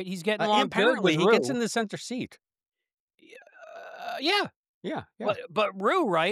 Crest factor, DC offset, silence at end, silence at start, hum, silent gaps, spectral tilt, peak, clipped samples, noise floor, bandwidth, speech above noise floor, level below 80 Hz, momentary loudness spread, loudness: 18 dB; under 0.1%; 0 s; 0 s; none; 2.93-3.08 s, 3.14-3.18 s, 4.56-4.81 s; -4.5 dB/octave; -10 dBFS; under 0.1%; -53 dBFS; 14.5 kHz; 27 dB; -76 dBFS; 18 LU; -26 LUFS